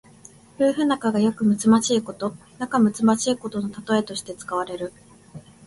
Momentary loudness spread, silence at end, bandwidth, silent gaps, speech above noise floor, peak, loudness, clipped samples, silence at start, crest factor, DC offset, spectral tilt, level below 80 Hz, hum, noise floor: 13 LU; 0.25 s; 11.5 kHz; none; 27 dB; -6 dBFS; -22 LUFS; under 0.1%; 0.6 s; 16 dB; under 0.1%; -5 dB/octave; -60 dBFS; none; -49 dBFS